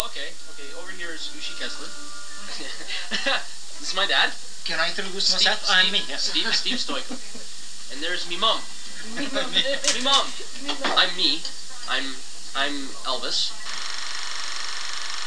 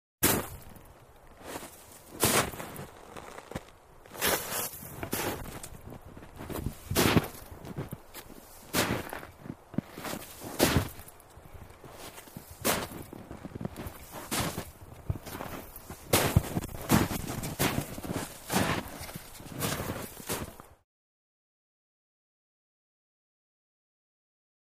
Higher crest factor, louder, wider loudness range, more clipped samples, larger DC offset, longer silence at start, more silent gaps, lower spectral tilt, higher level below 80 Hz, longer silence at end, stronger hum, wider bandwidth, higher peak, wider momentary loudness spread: about the same, 26 dB vs 26 dB; first, -24 LUFS vs -32 LUFS; about the same, 6 LU vs 7 LU; neither; first, 5% vs under 0.1%; second, 0 s vs 0.2 s; neither; second, -0.5 dB/octave vs -4 dB/octave; second, -74 dBFS vs -50 dBFS; second, 0 s vs 3.95 s; neither; second, 11 kHz vs 15.5 kHz; first, 0 dBFS vs -8 dBFS; second, 17 LU vs 21 LU